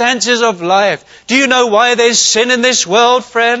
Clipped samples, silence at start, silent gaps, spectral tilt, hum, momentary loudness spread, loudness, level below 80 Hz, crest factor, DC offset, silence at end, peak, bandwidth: under 0.1%; 0 s; none; -1.5 dB/octave; none; 4 LU; -10 LUFS; -58 dBFS; 12 dB; under 0.1%; 0 s; 0 dBFS; 8.2 kHz